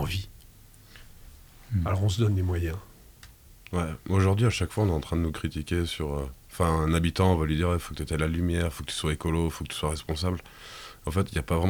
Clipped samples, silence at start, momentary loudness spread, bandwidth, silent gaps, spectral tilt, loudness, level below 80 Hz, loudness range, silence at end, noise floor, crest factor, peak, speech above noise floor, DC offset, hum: under 0.1%; 0 s; 10 LU; over 20 kHz; none; -6 dB/octave; -28 LUFS; -42 dBFS; 4 LU; 0 s; -52 dBFS; 18 dB; -10 dBFS; 25 dB; under 0.1%; none